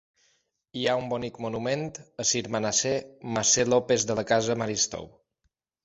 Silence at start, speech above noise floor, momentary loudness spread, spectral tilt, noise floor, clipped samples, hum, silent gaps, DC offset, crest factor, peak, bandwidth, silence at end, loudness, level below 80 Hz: 0.75 s; 50 dB; 10 LU; -3 dB/octave; -76 dBFS; under 0.1%; none; none; under 0.1%; 20 dB; -8 dBFS; 8 kHz; 0.75 s; -26 LUFS; -60 dBFS